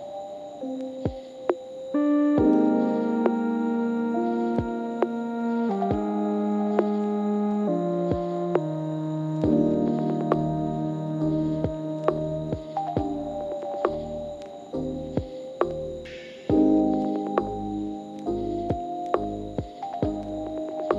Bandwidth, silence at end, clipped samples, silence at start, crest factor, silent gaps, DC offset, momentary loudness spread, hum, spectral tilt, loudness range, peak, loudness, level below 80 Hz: 7.6 kHz; 0 s; under 0.1%; 0 s; 20 dB; none; under 0.1%; 11 LU; none; -9 dB/octave; 6 LU; -6 dBFS; -27 LUFS; -48 dBFS